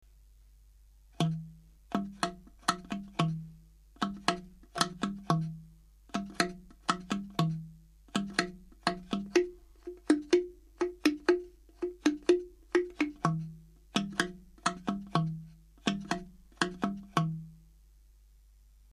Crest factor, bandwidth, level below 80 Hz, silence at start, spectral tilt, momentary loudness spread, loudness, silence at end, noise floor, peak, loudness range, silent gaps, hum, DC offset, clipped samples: 26 dB; 14 kHz; -58 dBFS; 1.2 s; -5 dB/octave; 12 LU; -33 LUFS; 1.35 s; -59 dBFS; -10 dBFS; 5 LU; none; none; under 0.1%; under 0.1%